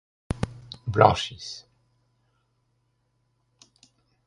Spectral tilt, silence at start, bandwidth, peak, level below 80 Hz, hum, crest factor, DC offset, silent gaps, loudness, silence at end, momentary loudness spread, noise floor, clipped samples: -5.5 dB/octave; 0.3 s; 11.5 kHz; 0 dBFS; -48 dBFS; none; 28 dB; under 0.1%; none; -24 LUFS; 2.65 s; 19 LU; -72 dBFS; under 0.1%